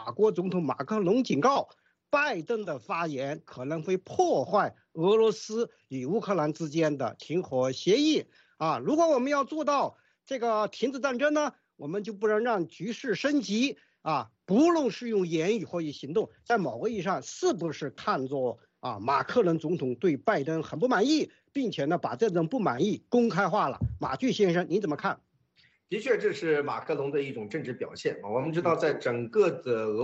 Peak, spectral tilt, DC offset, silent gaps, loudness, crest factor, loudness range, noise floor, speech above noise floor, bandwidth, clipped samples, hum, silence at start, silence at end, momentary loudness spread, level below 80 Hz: -12 dBFS; -5.5 dB/octave; under 0.1%; none; -28 LUFS; 16 dB; 3 LU; -66 dBFS; 38 dB; 8 kHz; under 0.1%; none; 0 s; 0 s; 10 LU; -62 dBFS